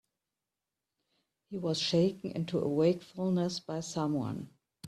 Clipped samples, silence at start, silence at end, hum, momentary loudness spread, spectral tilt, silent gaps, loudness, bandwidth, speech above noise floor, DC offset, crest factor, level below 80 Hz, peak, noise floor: under 0.1%; 1.5 s; 0 s; none; 10 LU; -6 dB/octave; none; -32 LUFS; 12.5 kHz; 58 dB; under 0.1%; 18 dB; -70 dBFS; -16 dBFS; -90 dBFS